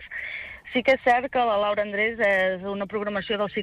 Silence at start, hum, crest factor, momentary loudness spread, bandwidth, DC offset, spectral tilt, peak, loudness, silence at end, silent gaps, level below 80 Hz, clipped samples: 0 s; none; 14 dB; 11 LU; 10.5 kHz; under 0.1%; -5.5 dB/octave; -10 dBFS; -24 LUFS; 0 s; none; -56 dBFS; under 0.1%